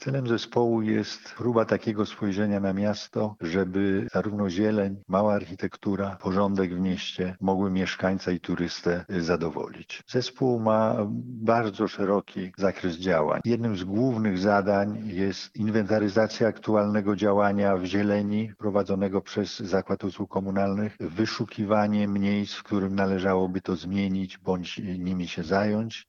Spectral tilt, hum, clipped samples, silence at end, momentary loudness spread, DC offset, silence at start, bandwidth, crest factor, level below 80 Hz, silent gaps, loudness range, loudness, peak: -7 dB/octave; none; under 0.1%; 0.05 s; 7 LU; under 0.1%; 0 s; 7.2 kHz; 18 dB; -62 dBFS; none; 3 LU; -27 LUFS; -8 dBFS